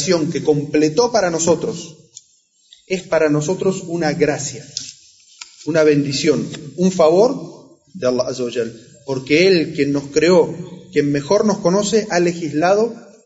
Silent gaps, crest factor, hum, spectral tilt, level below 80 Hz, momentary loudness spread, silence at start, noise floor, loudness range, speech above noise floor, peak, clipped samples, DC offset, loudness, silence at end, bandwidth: none; 14 dB; none; -5 dB/octave; -56 dBFS; 14 LU; 0 s; -57 dBFS; 4 LU; 41 dB; -2 dBFS; under 0.1%; under 0.1%; -17 LUFS; 0.2 s; 8 kHz